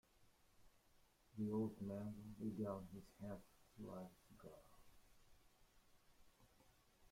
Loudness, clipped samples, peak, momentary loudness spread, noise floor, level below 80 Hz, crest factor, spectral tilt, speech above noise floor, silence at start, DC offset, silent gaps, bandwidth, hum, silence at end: -50 LUFS; under 0.1%; -34 dBFS; 18 LU; -75 dBFS; -74 dBFS; 20 dB; -8 dB/octave; 26 dB; 0.15 s; under 0.1%; none; 16.5 kHz; none; 0.05 s